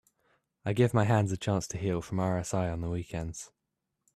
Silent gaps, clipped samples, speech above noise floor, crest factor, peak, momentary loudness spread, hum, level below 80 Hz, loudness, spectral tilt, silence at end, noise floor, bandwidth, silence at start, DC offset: none; under 0.1%; 55 dB; 18 dB; -12 dBFS; 13 LU; none; -54 dBFS; -31 LUFS; -6.5 dB/octave; 0.7 s; -84 dBFS; 13 kHz; 0.65 s; under 0.1%